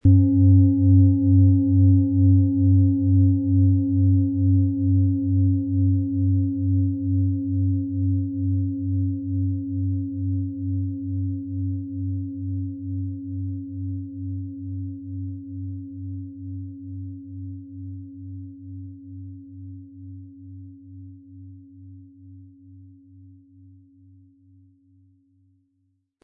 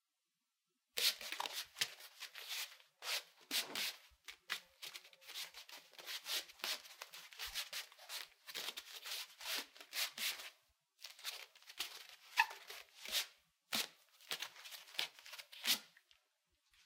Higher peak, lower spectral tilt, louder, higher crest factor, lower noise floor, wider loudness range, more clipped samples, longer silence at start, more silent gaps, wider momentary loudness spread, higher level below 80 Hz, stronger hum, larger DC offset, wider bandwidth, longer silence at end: first, -6 dBFS vs -16 dBFS; first, -16.5 dB/octave vs 1.5 dB/octave; first, -22 LUFS vs -43 LUFS; second, 16 dB vs 32 dB; second, -70 dBFS vs -89 dBFS; first, 22 LU vs 4 LU; neither; second, 0.05 s vs 0.95 s; neither; first, 23 LU vs 15 LU; first, -54 dBFS vs -84 dBFS; neither; neither; second, 0.9 kHz vs 17 kHz; first, 3.35 s vs 0.05 s